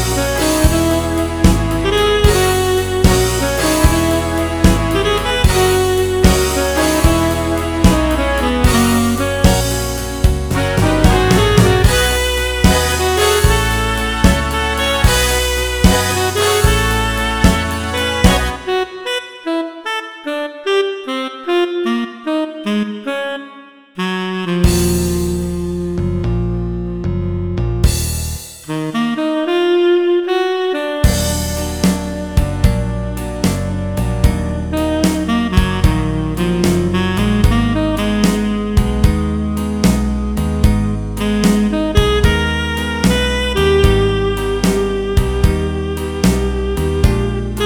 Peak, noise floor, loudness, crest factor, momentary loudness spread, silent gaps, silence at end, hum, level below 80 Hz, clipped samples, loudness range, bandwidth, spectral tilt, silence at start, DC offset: 0 dBFS; -39 dBFS; -15 LUFS; 14 dB; 8 LU; none; 0 s; none; -20 dBFS; under 0.1%; 5 LU; over 20 kHz; -5 dB/octave; 0 s; 0.3%